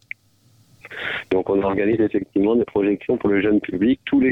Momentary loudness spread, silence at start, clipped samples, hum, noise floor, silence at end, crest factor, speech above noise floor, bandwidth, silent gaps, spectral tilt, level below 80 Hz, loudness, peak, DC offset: 10 LU; 0.85 s; under 0.1%; none; -57 dBFS; 0 s; 12 dB; 38 dB; 4.6 kHz; none; -8.5 dB/octave; -50 dBFS; -20 LUFS; -8 dBFS; under 0.1%